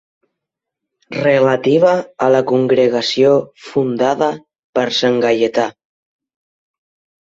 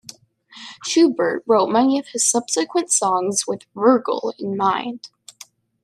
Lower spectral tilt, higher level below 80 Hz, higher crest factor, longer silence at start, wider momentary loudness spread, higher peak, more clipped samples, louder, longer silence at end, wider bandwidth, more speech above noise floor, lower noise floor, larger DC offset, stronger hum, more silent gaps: first, -5.5 dB/octave vs -3 dB/octave; first, -60 dBFS vs -72 dBFS; about the same, 16 dB vs 16 dB; first, 1.1 s vs 0.55 s; second, 8 LU vs 12 LU; first, 0 dBFS vs -4 dBFS; neither; first, -15 LUFS vs -19 LUFS; first, 1.5 s vs 0.75 s; second, 7.8 kHz vs 14 kHz; first, 67 dB vs 28 dB; first, -81 dBFS vs -47 dBFS; neither; neither; first, 4.59-4.73 s vs none